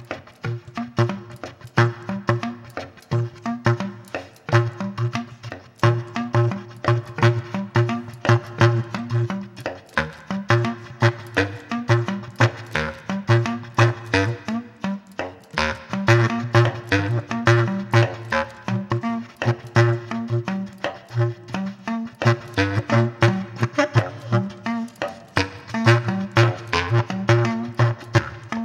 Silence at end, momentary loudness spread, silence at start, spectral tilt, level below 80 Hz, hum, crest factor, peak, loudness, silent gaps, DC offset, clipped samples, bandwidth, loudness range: 0 s; 11 LU; 0 s; -6.5 dB/octave; -52 dBFS; none; 20 dB; -2 dBFS; -22 LUFS; none; under 0.1%; under 0.1%; 8.8 kHz; 4 LU